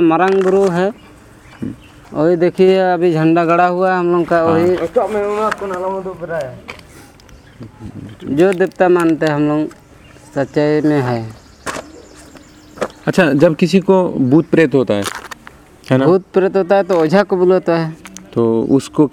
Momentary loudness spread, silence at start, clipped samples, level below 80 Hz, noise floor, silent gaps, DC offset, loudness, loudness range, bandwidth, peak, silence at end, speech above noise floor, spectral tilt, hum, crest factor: 17 LU; 0 s; under 0.1%; -50 dBFS; -41 dBFS; none; under 0.1%; -14 LUFS; 7 LU; 14.5 kHz; 0 dBFS; 0.05 s; 28 dB; -7 dB/octave; none; 14 dB